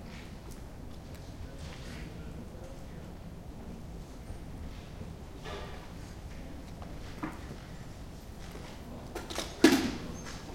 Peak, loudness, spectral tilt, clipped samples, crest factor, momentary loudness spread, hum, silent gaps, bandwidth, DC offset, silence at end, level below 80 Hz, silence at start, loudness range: -6 dBFS; -38 LUFS; -4.5 dB/octave; under 0.1%; 32 dB; 10 LU; none; none; 16.5 kHz; under 0.1%; 0 s; -48 dBFS; 0 s; 12 LU